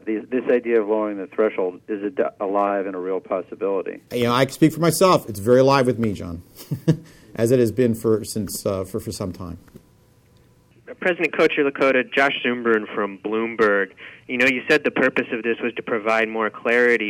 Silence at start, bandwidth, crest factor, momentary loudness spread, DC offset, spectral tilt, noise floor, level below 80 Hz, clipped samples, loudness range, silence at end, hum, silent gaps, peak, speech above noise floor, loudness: 0.05 s; 17 kHz; 18 dB; 11 LU; under 0.1%; -5.5 dB/octave; -55 dBFS; -58 dBFS; under 0.1%; 5 LU; 0 s; none; none; -4 dBFS; 34 dB; -21 LUFS